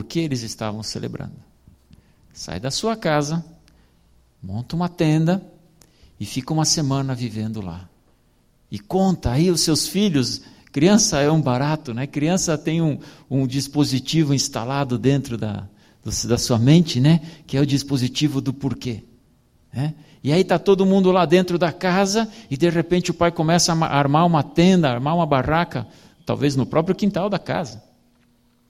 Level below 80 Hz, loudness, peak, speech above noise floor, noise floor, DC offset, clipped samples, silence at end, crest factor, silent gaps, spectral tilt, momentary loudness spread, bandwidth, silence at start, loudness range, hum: -46 dBFS; -20 LUFS; -2 dBFS; 40 dB; -59 dBFS; under 0.1%; under 0.1%; 0.9 s; 18 dB; none; -5 dB/octave; 14 LU; 15.5 kHz; 0 s; 7 LU; none